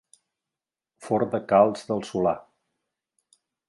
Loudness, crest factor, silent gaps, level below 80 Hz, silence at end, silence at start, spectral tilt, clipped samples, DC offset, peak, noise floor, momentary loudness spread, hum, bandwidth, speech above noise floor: -24 LUFS; 22 dB; none; -64 dBFS; 1.3 s; 1 s; -6.5 dB/octave; under 0.1%; under 0.1%; -4 dBFS; -89 dBFS; 10 LU; none; 11.5 kHz; 66 dB